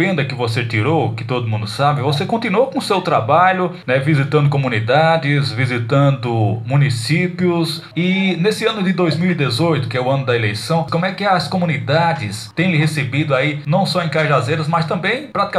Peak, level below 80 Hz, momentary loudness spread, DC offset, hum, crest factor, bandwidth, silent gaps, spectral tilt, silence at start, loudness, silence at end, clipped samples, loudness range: -2 dBFS; -58 dBFS; 5 LU; under 0.1%; none; 14 dB; 13 kHz; none; -6.5 dB/octave; 0 s; -17 LUFS; 0 s; under 0.1%; 2 LU